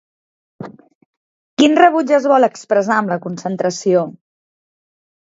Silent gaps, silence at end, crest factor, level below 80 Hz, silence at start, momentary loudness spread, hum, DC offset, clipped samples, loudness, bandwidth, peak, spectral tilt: 0.95-1.57 s; 1.2 s; 18 dB; -66 dBFS; 0.6 s; 23 LU; none; under 0.1%; under 0.1%; -15 LUFS; 7.8 kHz; 0 dBFS; -5 dB/octave